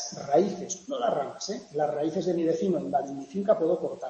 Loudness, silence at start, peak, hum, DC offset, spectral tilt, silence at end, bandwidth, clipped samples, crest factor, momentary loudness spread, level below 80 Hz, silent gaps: -28 LUFS; 0 s; -10 dBFS; none; under 0.1%; -5.5 dB/octave; 0 s; 8.6 kHz; under 0.1%; 18 dB; 8 LU; -72 dBFS; none